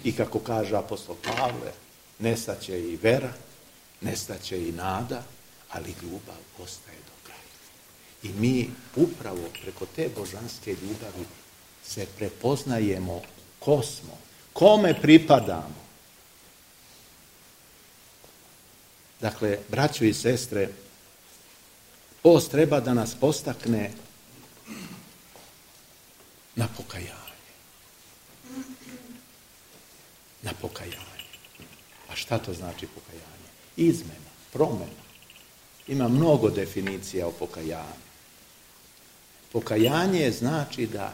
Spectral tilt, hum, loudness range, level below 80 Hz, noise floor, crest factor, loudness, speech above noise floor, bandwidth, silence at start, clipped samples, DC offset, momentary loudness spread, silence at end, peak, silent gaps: -5.5 dB/octave; none; 17 LU; -58 dBFS; -54 dBFS; 26 dB; -26 LUFS; 28 dB; 16 kHz; 0 s; under 0.1%; under 0.1%; 25 LU; 0 s; -2 dBFS; none